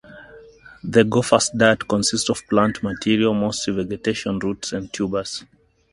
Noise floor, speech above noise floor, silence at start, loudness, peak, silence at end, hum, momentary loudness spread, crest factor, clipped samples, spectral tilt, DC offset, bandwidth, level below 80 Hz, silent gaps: -45 dBFS; 25 dB; 0.1 s; -20 LUFS; 0 dBFS; 0.5 s; none; 10 LU; 20 dB; under 0.1%; -4 dB/octave; under 0.1%; 11.5 kHz; -50 dBFS; none